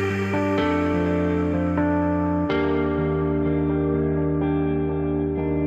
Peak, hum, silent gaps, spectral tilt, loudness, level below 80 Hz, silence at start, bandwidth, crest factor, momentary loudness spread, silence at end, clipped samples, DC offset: -10 dBFS; none; none; -8.5 dB/octave; -23 LUFS; -38 dBFS; 0 s; 8 kHz; 12 dB; 2 LU; 0 s; under 0.1%; under 0.1%